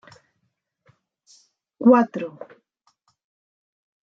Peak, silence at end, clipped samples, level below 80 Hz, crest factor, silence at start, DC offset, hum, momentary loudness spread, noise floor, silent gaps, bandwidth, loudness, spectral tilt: -4 dBFS; 1.75 s; under 0.1%; -80 dBFS; 22 dB; 1.8 s; under 0.1%; none; 28 LU; -74 dBFS; none; 7 kHz; -19 LUFS; -8 dB/octave